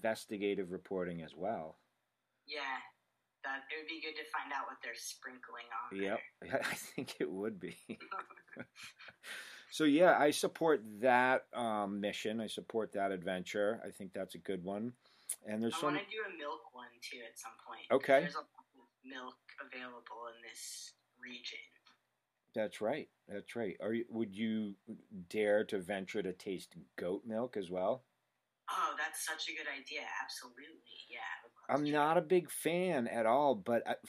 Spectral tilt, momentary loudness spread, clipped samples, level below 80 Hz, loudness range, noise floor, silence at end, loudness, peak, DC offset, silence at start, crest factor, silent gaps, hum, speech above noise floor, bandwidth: -4 dB/octave; 18 LU; under 0.1%; -84 dBFS; 11 LU; -85 dBFS; 0 s; -38 LUFS; -14 dBFS; under 0.1%; 0 s; 24 dB; none; none; 47 dB; 15.5 kHz